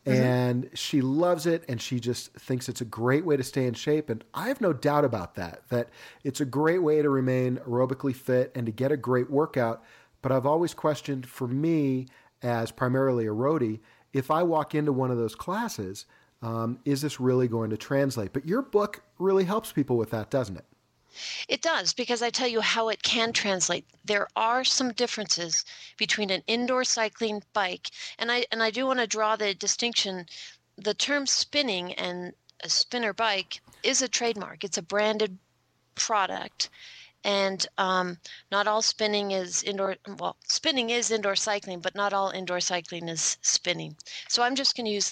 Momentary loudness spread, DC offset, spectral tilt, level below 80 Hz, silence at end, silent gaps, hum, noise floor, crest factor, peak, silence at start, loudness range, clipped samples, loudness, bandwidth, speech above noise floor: 10 LU; under 0.1%; -3.5 dB/octave; -68 dBFS; 0 s; none; none; -69 dBFS; 18 dB; -10 dBFS; 0.05 s; 3 LU; under 0.1%; -27 LUFS; 16.5 kHz; 42 dB